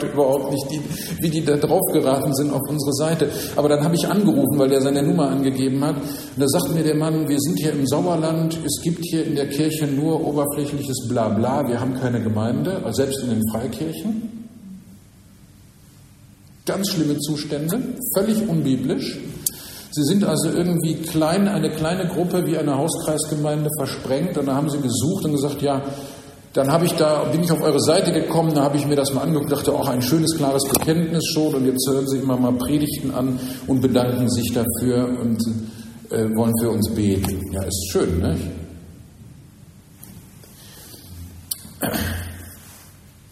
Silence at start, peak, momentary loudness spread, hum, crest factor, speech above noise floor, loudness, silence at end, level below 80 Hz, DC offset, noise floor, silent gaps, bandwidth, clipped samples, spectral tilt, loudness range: 0 s; 0 dBFS; 9 LU; none; 20 dB; 27 dB; -21 LUFS; 0.4 s; -48 dBFS; under 0.1%; -47 dBFS; none; 16 kHz; under 0.1%; -5.5 dB/octave; 8 LU